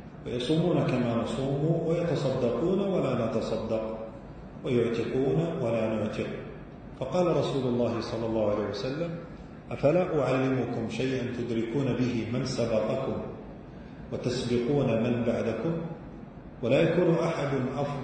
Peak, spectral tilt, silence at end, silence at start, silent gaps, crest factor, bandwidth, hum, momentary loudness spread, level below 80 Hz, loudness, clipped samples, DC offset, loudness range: -12 dBFS; -7.5 dB/octave; 0 s; 0 s; none; 18 dB; 9.4 kHz; none; 14 LU; -52 dBFS; -28 LUFS; under 0.1%; under 0.1%; 3 LU